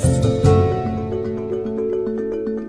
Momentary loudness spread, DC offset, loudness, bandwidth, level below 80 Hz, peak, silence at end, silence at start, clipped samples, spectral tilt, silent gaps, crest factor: 9 LU; under 0.1%; -20 LUFS; 11 kHz; -34 dBFS; -2 dBFS; 0 s; 0 s; under 0.1%; -7.5 dB/octave; none; 18 dB